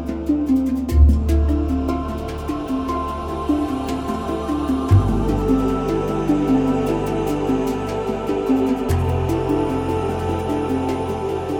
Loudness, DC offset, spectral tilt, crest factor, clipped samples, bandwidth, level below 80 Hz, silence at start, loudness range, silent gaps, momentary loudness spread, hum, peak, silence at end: -20 LUFS; under 0.1%; -8 dB/octave; 16 dB; under 0.1%; 16.5 kHz; -26 dBFS; 0 s; 3 LU; none; 7 LU; none; -2 dBFS; 0 s